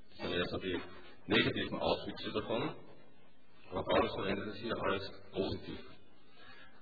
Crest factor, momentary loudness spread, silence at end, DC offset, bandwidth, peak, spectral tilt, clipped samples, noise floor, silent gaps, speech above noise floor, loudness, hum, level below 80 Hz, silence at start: 22 dB; 20 LU; 0.15 s; 0.4%; 5 kHz; -18 dBFS; -3 dB/octave; under 0.1%; -66 dBFS; none; 29 dB; -36 LUFS; none; -58 dBFS; 0.1 s